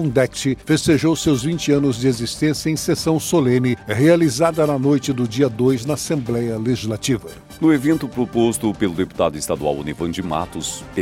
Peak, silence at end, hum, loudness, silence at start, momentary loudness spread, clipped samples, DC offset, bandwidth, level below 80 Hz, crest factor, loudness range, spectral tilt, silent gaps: -2 dBFS; 0 s; none; -19 LUFS; 0 s; 7 LU; under 0.1%; under 0.1%; 16.5 kHz; -44 dBFS; 16 dB; 3 LU; -5.5 dB/octave; none